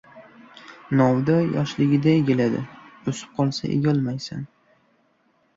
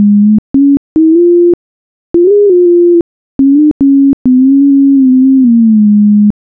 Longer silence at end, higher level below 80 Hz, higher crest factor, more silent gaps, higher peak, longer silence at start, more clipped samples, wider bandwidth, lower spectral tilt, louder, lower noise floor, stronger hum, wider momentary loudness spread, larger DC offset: first, 1.1 s vs 0.2 s; second, -58 dBFS vs -40 dBFS; first, 18 dB vs 4 dB; second, none vs 0.38-0.54 s, 0.77-0.96 s, 1.54-2.14 s, 3.01-3.39 s, 3.71-3.80 s, 4.13-4.25 s; second, -6 dBFS vs -2 dBFS; first, 0.15 s vs 0 s; neither; first, 7.8 kHz vs 1.3 kHz; second, -7.5 dB/octave vs -14.5 dB/octave; second, -22 LUFS vs -7 LUFS; second, -64 dBFS vs under -90 dBFS; neither; first, 17 LU vs 4 LU; neither